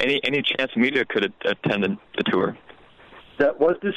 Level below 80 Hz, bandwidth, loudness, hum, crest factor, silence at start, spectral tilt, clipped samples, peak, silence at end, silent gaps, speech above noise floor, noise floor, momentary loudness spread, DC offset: -60 dBFS; 10 kHz; -22 LUFS; none; 18 dB; 0 s; -6 dB/octave; under 0.1%; -6 dBFS; 0 s; none; 26 dB; -48 dBFS; 5 LU; under 0.1%